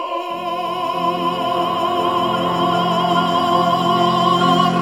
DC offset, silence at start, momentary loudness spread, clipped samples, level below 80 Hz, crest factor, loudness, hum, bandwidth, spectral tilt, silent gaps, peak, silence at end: 0.1%; 0 s; 7 LU; under 0.1%; -62 dBFS; 16 dB; -17 LUFS; none; 16.5 kHz; -5.5 dB/octave; none; -2 dBFS; 0 s